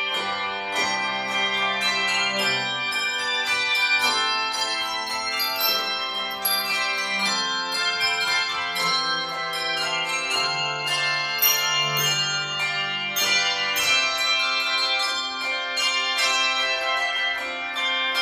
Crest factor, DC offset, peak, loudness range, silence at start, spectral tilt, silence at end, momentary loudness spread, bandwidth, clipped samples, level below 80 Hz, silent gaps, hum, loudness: 16 dB; under 0.1%; -8 dBFS; 2 LU; 0 s; 0 dB/octave; 0 s; 6 LU; 15.5 kHz; under 0.1%; -64 dBFS; none; none; -22 LUFS